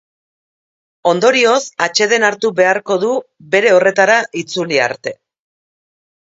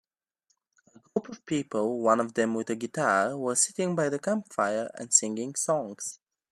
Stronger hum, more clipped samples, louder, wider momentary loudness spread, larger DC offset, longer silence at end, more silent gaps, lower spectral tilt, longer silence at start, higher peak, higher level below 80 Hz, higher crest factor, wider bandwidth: neither; neither; first, -13 LUFS vs -28 LUFS; about the same, 10 LU vs 11 LU; neither; first, 1.25 s vs 0.35 s; neither; about the same, -3 dB/octave vs -3.5 dB/octave; about the same, 1.05 s vs 1.15 s; first, 0 dBFS vs -6 dBFS; first, -64 dBFS vs -76 dBFS; second, 16 dB vs 24 dB; second, 8 kHz vs 14.5 kHz